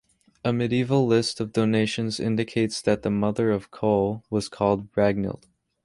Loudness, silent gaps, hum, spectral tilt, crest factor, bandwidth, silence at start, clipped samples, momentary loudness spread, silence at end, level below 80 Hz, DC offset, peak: -24 LUFS; none; none; -6 dB/octave; 18 dB; 11.5 kHz; 0.45 s; under 0.1%; 6 LU; 0.5 s; -54 dBFS; under 0.1%; -6 dBFS